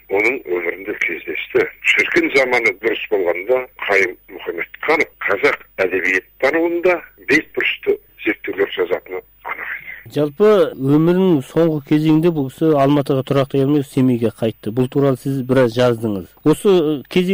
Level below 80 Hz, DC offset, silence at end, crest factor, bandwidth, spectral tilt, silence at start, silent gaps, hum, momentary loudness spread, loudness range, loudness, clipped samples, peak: -52 dBFS; under 0.1%; 0 s; 14 dB; 16 kHz; -6.5 dB/octave; 0.1 s; none; none; 9 LU; 3 LU; -17 LUFS; under 0.1%; -2 dBFS